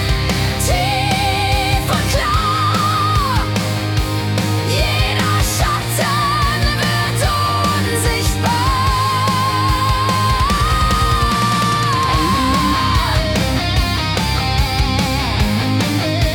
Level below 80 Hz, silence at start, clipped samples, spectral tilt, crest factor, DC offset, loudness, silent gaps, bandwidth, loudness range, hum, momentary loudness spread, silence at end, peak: -24 dBFS; 0 s; under 0.1%; -4.5 dB/octave; 12 dB; under 0.1%; -16 LUFS; none; 18 kHz; 1 LU; none; 2 LU; 0 s; -4 dBFS